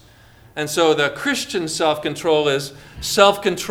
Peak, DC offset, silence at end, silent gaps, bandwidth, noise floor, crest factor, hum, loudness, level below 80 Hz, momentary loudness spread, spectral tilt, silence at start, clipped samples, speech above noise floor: 0 dBFS; under 0.1%; 0 s; none; 18 kHz; -48 dBFS; 20 dB; none; -19 LUFS; -50 dBFS; 13 LU; -3 dB/octave; 0.55 s; under 0.1%; 29 dB